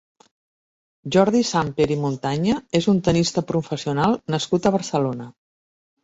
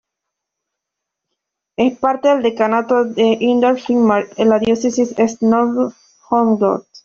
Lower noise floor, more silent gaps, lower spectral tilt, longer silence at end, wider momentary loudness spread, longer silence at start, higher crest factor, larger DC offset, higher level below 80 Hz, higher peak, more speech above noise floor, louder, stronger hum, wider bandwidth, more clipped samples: first, under -90 dBFS vs -80 dBFS; neither; about the same, -5.5 dB/octave vs -5.5 dB/octave; first, 0.75 s vs 0.05 s; first, 7 LU vs 4 LU; second, 1.05 s vs 1.8 s; about the same, 18 dB vs 16 dB; neither; about the same, -52 dBFS vs -56 dBFS; second, -4 dBFS vs 0 dBFS; first, over 70 dB vs 66 dB; second, -21 LUFS vs -16 LUFS; neither; about the same, 8 kHz vs 7.6 kHz; neither